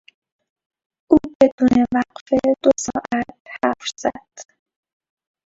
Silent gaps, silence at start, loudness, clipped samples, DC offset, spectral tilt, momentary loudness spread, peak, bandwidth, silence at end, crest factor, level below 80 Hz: 1.35-1.40 s, 1.52-1.58 s, 2.21-2.26 s, 3.40-3.45 s; 1.1 s; -19 LUFS; under 0.1%; under 0.1%; -4.5 dB/octave; 10 LU; 0 dBFS; 8 kHz; 1.1 s; 20 dB; -50 dBFS